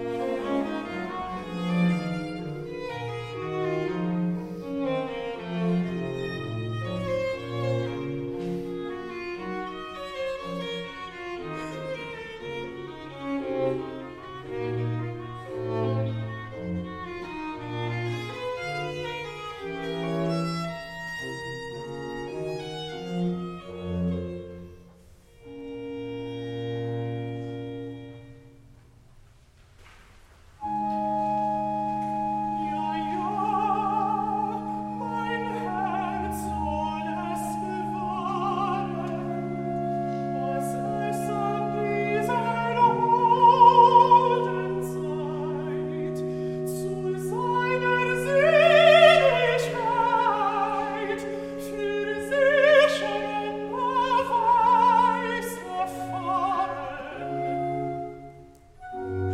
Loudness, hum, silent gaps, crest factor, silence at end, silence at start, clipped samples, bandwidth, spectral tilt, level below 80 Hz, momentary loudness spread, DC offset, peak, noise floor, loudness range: -26 LUFS; none; none; 22 dB; 0 s; 0 s; under 0.1%; 15.5 kHz; -6 dB/octave; -54 dBFS; 16 LU; under 0.1%; -4 dBFS; -55 dBFS; 15 LU